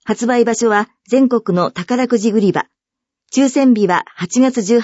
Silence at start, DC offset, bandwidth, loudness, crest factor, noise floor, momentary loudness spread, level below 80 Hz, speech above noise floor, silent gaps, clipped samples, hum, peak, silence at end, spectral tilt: 0.05 s; under 0.1%; 8 kHz; -15 LUFS; 14 dB; -83 dBFS; 6 LU; -62 dBFS; 69 dB; none; under 0.1%; none; -2 dBFS; 0 s; -5 dB/octave